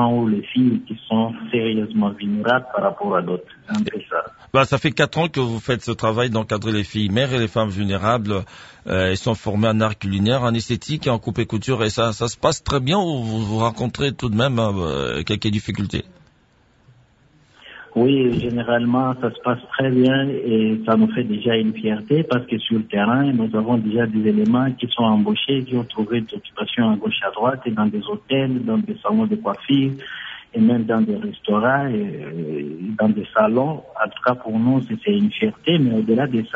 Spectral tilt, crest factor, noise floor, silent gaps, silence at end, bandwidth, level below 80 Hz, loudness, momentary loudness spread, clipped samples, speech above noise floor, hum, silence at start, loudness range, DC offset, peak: -6.5 dB/octave; 18 dB; -57 dBFS; none; 0 s; 8 kHz; -46 dBFS; -20 LUFS; 7 LU; under 0.1%; 37 dB; none; 0 s; 3 LU; under 0.1%; -2 dBFS